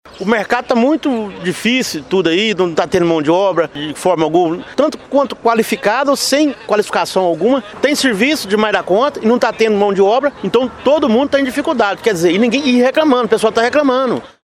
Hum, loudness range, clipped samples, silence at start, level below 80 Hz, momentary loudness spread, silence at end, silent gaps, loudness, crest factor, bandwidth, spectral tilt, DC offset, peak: none; 2 LU; under 0.1%; 0.05 s; -52 dBFS; 4 LU; 0.2 s; none; -14 LUFS; 14 dB; 16 kHz; -4.5 dB/octave; under 0.1%; 0 dBFS